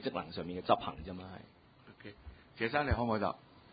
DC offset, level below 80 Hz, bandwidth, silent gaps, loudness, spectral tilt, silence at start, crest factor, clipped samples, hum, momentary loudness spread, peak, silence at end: under 0.1%; -50 dBFS; 4.9 kHz; none; -36 LUFS; -4.5 dB/octave; 0 s; 24 dB; under 0.1%; none; 21 LU; -12 dBFS; 0.15 s